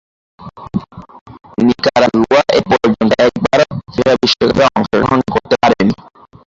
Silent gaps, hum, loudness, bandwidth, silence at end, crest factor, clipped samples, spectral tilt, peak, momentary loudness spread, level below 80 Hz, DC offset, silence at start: 1.21-1.26 s; none; -13 LUFS; 7.8 kHz; 0.55 s; 14 dB; under 0.1%; -5.5 dB/octave; 0 dBFS; 12 LU; -42 dBFS; under 0.1%; 0.4 s